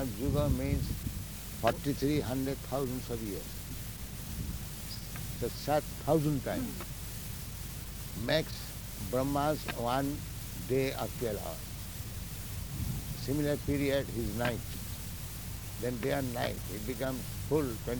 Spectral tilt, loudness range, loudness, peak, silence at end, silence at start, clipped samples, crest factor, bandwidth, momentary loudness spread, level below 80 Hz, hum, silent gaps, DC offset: -5.5 dB/octave; 3 LU; -35 LUFS; -12 dBFS; 0 s; 0 s; under 0.1%; 22 dB; over 20 kHz; 10 LU; -44 dBFS; none; none; under 0.1%